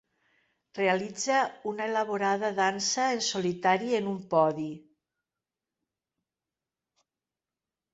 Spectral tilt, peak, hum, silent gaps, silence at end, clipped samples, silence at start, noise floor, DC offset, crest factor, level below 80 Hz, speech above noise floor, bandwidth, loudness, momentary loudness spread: -3.5 dB/octave; -12 dBFS; none; none; 3.15 s; under 0.1%; 0.75 s; under -90 dBFS; under 0.1%; 20 dB; -76 dBFS; over 62 dB; 8.4 kHz; -28 LUFS; 7 LU